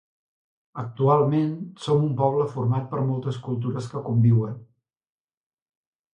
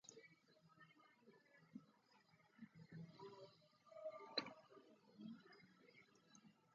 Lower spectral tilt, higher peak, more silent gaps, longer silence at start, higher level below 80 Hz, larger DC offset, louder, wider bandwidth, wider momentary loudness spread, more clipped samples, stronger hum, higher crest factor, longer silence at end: first, -9 dB/octave vs -2.5 dB/octave; first, -8 dBFS vs -28 dBFS; neither; first, 0.75 s vs 0.05 s; first, -62 dBFS vs under -90 dBFS; neither; first, -24 LUFS vs -57 LUFS; first, 9.4 kHz vs 7.2 kHz; second, 13 LU vs 20 LU; neither; neither; second, 18 dB vs 32 dB; first, 1.5 s vs 0 s